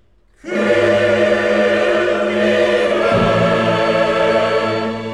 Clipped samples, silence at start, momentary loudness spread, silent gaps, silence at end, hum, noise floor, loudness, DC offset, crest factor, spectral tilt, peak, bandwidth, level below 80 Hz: under 0.1%; 0.45 s; 3 LU; none; 0 s; none; -36 dBFS; -15 LUFS; 0.3%; 12 dB; -5.5 dB/octave; -4 dBFS; 11.5 kHz; -44 dBFS